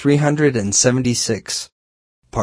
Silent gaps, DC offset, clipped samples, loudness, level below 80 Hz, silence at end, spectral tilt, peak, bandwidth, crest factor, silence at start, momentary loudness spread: 1.72-2.22 s; under 0.1%; under 0.1%; -17 LUFS; -46 dBFS; 0 s; -4 dB/octave; -2 dBFS; 11 kHz; 16 dB; 0 s; 11 LU